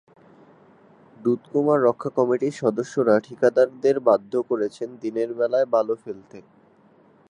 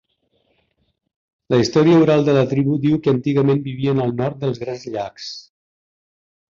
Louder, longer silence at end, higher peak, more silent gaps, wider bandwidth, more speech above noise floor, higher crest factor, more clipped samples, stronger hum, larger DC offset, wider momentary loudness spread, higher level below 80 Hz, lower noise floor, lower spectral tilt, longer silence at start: second, -22 LUFS vs -18 LUFS; second, 0.9 s vs 1.1 s; about the same, -4 dBFS vs -4 dBFS; neither; first, 10 kHz vs 7.4 kHz; second, 34 dB vs 49 dB; about the same, 18 dB vs 16 dB; neither; neither; neither; second, 9 LU vs 14 LU; second, -74 dBFS vs -56 dBFS; second, -56 dBFS vs -66 dBFS; about the same, -7 dB/octave vs -7.5 dB/octave; second, 1.2 s vs 1.5 s